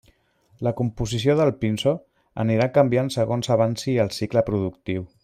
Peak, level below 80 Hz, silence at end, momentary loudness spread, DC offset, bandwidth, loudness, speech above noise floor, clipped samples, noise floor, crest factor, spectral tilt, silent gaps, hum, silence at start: -4 dBFS; -50 dBFS; 0.15 s; 9 LU; under 0.1%; 15.5 kHz; -23 LUFS; 39 dB; under 0.1%; -61 dBFS; 20 dB; -6.5 dB/octave; none; none; 0.6 s